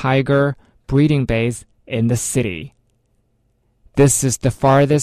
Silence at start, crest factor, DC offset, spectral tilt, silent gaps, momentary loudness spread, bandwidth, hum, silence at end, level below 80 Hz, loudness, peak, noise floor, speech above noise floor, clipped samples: 0 s; 14 dB; under 0.1%; -5.5 dB/octave; none; 14 LU; 13.5 kHz; none; 0 s; -40 dBFS; -17 LUFS; -4 dBFS; -63 dBFS; 47 dB; under 0.1%